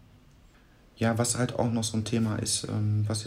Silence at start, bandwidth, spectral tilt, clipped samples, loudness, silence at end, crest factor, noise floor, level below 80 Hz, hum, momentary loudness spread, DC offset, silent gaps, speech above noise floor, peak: 0.95 s; 15.5 kHz; -4.5 dB/octave; under 0.1%; -28 LUFS; 0 s; 16 dB; -57 dBFS; -58 dBFS; none; 2 LU; under 0.1%; none; 30 dB; -12 dBFS